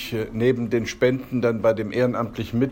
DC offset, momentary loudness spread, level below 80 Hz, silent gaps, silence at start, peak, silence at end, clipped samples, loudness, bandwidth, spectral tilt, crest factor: under 0.1%; 5 LU; -48 dBFS; none; 0 s; -8 dBFS; 0 s; under 0.1%; -23 LUFS; 16.5 kHz; -6.5 dB/octave; 14 dB